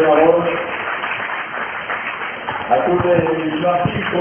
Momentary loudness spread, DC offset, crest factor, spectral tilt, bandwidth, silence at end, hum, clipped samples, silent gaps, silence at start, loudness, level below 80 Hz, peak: 9 LU; under 0.1%; 16 dB; -9.5 dB/octave; 3.4 kHz; 0 s; none; under 0.1%; none; 0 s; -18 LUFS; -46 dBFS; 0 dBFS